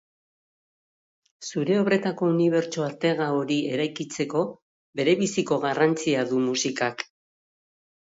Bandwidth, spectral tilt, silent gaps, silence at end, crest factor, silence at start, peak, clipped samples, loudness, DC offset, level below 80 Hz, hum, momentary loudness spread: 8 kHz; -5 dB/octave; 4.62-4.93 s; 0.95 s; 18 dB; 1.4 s; -8 dBFS; under 0.1%; -25 LUFS; under 0.1%; -70 dBFS; none; 9 LU